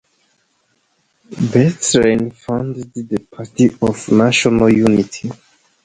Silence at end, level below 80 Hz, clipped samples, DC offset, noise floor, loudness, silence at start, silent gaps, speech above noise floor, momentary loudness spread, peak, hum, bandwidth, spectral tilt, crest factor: 0.5 s; -46 dBFS; under 0.1%; under 0.1%; -63 dBFS; -15 LUFS; 1.3 s; none; 48 dB; 15 LU; 0 dBFS; none; 10.5 kHz; -5 dB/octave; 16 dB